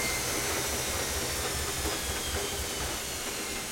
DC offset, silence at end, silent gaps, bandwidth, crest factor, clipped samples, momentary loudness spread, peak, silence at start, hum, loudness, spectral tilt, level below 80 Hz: under 0.1%; 0 s; none; 16.5 kHz; 16 dB; under 0.1%; 4 LU; -16 dBFS; 0 s; none; -30 LUFS; -2 dB/octave; -44 dBFS